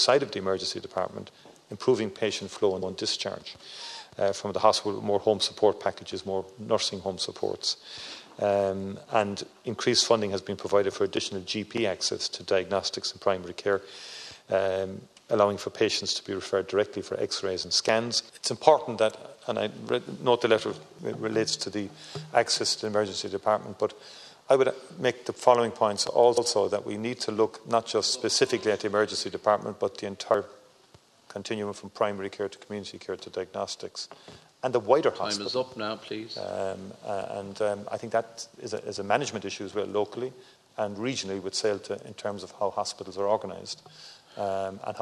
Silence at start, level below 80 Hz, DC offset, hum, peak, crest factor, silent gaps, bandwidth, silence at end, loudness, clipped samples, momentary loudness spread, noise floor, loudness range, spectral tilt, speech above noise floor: 0 s; -72 dBFS; under 0.1%; none; -2 dBFS; 26 dB; none; 13 kHz; 0 s; -28 LUFS; under 0.1%; 14 LU; -58 dBFS; 7 LU; -3.5 dB/octave; 30 dB